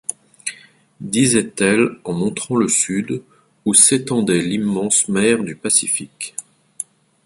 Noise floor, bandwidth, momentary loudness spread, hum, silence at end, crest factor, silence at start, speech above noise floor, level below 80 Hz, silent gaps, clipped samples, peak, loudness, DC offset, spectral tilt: -42 dBFS; 12 kHz; 16 LU; none; 0.4 s; 18 dB; 0.1 s; 24 dB; -58 dBFS; none; under 0.1%; 0 dBFS; -16 LUFS; under 0.1%; -3.5 dB/octave